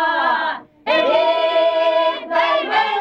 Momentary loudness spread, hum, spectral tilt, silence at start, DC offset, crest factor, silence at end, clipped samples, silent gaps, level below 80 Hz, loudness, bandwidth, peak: 4 LU; none; -3 dB/octave; 0 s; under 0.1%; 12 dB; 0 s; under 0.1%; none; -66 dBFS; -17 LUFS; 7 kHz; -6 dBFS